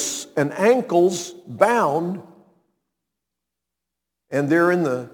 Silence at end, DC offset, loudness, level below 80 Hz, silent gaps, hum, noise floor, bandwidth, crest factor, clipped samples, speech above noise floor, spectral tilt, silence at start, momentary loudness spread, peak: 0.05 s; under 0.1%; -20 LUFS; -74 dBFS; none; none; -84 dBFS; 19 kHz; 22 dB; under 0.1%; 64 dB; -5 dB/octave; 0 s; 12 LU; 0 dBFS